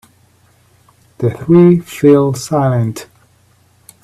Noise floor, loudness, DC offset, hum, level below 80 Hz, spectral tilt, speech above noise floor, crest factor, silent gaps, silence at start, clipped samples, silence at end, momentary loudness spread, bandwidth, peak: -52 dBFS; -12 LUFS; under 0.1%; none; -50 dBFS; -8 dB/octave; 41 dB; 14 dB; none; 1.2 s; under 0.1%; 1 s; 11 LU; 14 kHz; 0 dBFS